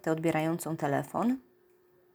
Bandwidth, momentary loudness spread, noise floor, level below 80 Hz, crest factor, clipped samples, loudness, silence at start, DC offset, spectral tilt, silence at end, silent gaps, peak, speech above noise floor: over 20 kHz; 3 LU; -64 dBFS; -72 dBFS; 18 dB; under 0.1%; -31 LUFS; 0.05 s; under 0.1%; -6.5 dB/octave; 0.75 s; none; -14 dBFS; 34 dB